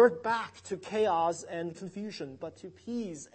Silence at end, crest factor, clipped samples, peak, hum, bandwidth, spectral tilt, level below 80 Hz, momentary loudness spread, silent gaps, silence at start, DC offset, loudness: 0.1 s; 20 dB; under 0.1%; -10 dBFS; none; 8.8 kHz; -5 dB/octave; -72 dBFS; 14 LU; none; 0 s; under 0.1%; -33 LUFS